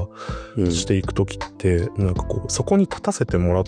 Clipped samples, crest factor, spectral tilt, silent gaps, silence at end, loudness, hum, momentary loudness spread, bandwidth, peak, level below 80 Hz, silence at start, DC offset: under 0.1%; 16 dB; -6 dB/octave; none; 0 s; -22 LUFS; none; 7 LU; 10 kHz; -6 dBFS; -36 dBFS; 0 s; under 0.1%